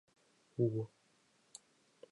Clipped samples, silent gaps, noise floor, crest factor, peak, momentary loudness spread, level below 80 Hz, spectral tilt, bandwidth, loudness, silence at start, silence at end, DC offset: under 0.1%; none; -73 dBFS; 22 dB; -20 dBFS; 21 LU; -82 dBFS; -8.5 dB/octave; 11 kHz; -39 LUFS; 0.6 s; 1.25 s; under 0.1%